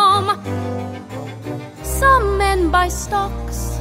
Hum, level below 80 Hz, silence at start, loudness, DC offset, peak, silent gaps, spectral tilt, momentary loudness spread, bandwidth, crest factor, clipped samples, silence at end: none; -28 dBFS; 0 s; -18 LUFS; under 0.1%; -2 dBFS; none; -4.5 dB/octave; 15 LU; 16 kHz; 16 dB; under 0.1%; 0 s